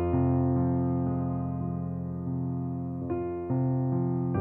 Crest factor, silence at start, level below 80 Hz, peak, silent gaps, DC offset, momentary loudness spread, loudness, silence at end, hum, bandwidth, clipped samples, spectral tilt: 12 dB; 0 s; -50 dBFS; -16 dBFS; none; under 0.1%; 7 LU; -30 LUFS; 0 s; none; 2.6 kHz; under 0.1%; -13.5 dB/octave